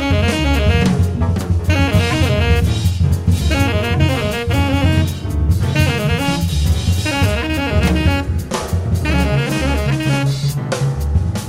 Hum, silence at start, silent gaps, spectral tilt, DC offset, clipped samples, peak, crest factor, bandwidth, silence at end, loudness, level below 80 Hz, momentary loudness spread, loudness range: none; 0 s; none; -6 dB/octave; under 0.1%; under 0.1%; -4 dBFS; 12 dB; 16 kHz; 0 s; -16 LUFS; -22 dBFS; 4 LU; 2 LU